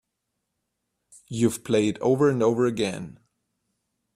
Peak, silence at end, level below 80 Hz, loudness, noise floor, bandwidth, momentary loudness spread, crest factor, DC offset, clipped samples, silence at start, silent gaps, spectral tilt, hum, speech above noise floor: -8 dBFS; 1.05 s; -62 dBFS; -23 LUFS; -80 dBFS; 15.5 kHz; 15 LU; 18 dB; under 0.1%; under 0.1%; 1.3 s; none; -6 dB/octave; none; 57 dB